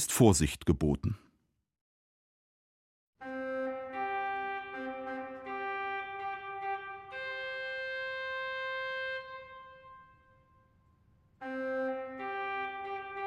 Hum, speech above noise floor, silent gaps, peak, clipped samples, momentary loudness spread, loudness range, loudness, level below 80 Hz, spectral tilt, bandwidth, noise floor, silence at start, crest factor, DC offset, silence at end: none; 50 dB; 1.81-3.13 s; -10 dBFS; under 0.1%; 13 LU; 4 LU; -35 LUFS; -54 dBFS; -4.5 dB/octave; 16 kHz; -77 dBFS; 0 s; 26 dB; under 0.1%; 0 s